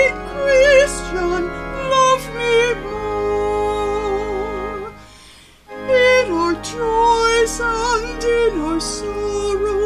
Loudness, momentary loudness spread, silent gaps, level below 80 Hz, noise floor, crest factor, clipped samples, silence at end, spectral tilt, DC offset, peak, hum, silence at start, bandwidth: -17 LUFS; 11 LU; none; -34 dBFS; -44 dBFS; 16 dB; under 0.1%; 0 s; -3.5 dB/octave; under 0.1%; -2 dBFS; none; 0 s; 14 kHz